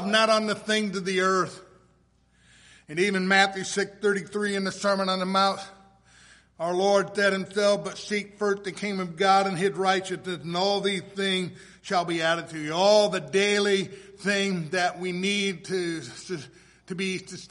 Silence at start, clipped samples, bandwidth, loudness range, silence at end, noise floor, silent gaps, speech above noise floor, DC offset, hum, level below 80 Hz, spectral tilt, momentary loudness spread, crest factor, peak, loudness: 0 s; under 0.1%; 11.5 kHz; 3 LU; 0.05 s; -63 dBFS; none; 38 dB; under 0.1%; none; -66 dBFS; -4 dB/octave; 12 LU; 22 dB; -4 dBFS; -25 LUFS